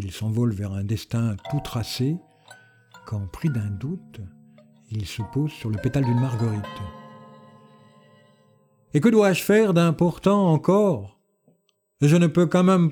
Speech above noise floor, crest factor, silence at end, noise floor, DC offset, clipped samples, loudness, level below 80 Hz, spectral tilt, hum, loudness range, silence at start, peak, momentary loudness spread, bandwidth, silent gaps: 46 dB; 18 dB; 0 s; -67 dBFS; under 0.1%; under 0.1%; -22 LUFS; -52 dBFS; -7 dB/octave; none; 10 LU; 0 s; -6 dBFS; 16 LU; 19 kHz; none